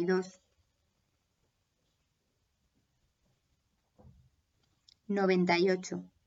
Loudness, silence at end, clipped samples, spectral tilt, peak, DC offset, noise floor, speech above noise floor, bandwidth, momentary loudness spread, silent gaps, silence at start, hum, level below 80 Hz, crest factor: -30 LUFS; 0.2 s; under 0.1%; -6 dB/octave; -16 dBFS; under 0.1%; -78 dBFS; 49 dB; 7.8 kHz; 13 LU; none; 0 s; none; -76 dBFS; 20 dB